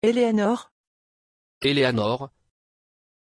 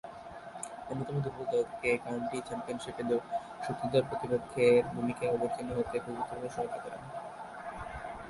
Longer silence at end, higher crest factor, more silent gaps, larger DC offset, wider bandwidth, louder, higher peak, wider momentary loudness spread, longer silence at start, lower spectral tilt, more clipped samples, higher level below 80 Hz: first, 0.95 s vs 0 s; about the same, 18 dB vs 20 dB; first, 0.71-1.61 s vs none; neither; about the same, 11 kHz vs 11.5 kHz; first, -23 LUFS vs -34 LUFS; first, -8 dBFS vs -14 dBFS; second, 10 LU vs 15 LU; about the same, 0 s vs 0.05 s; about the same, -6 dB/octave vs -6 dB/octave; neither; about the same, -62 dBFS vs -60 dBFS